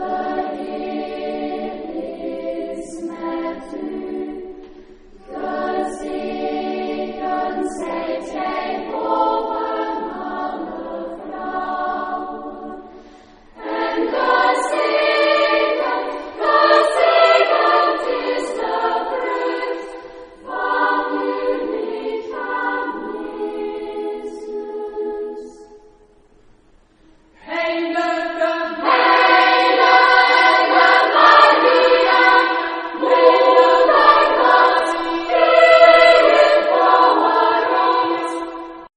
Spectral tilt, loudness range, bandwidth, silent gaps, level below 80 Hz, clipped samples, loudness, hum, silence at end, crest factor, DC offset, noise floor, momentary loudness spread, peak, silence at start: -3 dB/octave; 16 LU; 10 kHz; none; -52 dBFS; under 0.1%; -16 LUFS; none; 0.1 s; 18 dB; under 0.1%; -52 dBFS; 17 LU; 0 dBFS; 0 s